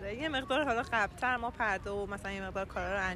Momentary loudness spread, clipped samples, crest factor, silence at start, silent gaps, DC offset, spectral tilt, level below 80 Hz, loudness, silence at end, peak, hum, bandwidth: 7 LU; under 0.1%; 16 dB; 0 s; none; under 0.1%; -4.5 dB/octave; -50 dBFS; -34 LUFS; 0 s; -18 dBFS; none; 13.5 kHz